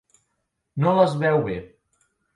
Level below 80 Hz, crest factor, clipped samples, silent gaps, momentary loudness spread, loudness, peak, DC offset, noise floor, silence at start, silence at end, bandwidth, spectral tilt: -56 dBFS; 20 dB; under 0.1%; none; 15 LU; -21 LUFS; -4 dBFS; under 0.1%; -76 dBFS; 0.75 s; 0.7 s; 11.5 kHz; -8 dB/octave